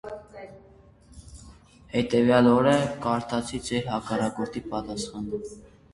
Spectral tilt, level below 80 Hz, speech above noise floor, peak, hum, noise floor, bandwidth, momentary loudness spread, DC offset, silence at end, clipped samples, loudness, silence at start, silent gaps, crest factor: -6 dB/octave; -52 dBFS; 29 dB; -6 dBFS; none; -54 dBFS; 11.5 kHz; 23 LU; under 0.1%; 0.3 s; under 0.1%; -25 LUFS; 0.05 s; none; 22 dB